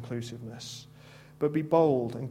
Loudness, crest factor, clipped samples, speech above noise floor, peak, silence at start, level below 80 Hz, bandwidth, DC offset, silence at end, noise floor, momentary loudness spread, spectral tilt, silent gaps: -28 LUFS; 18 dB; under 0.1%; 23 dB; -12 dBFS; 0 s; -66 dBFS; 15.5 kHz; under 0.1%; 0 s; -52 dBFS; 17 LU; -7 dB/octave; none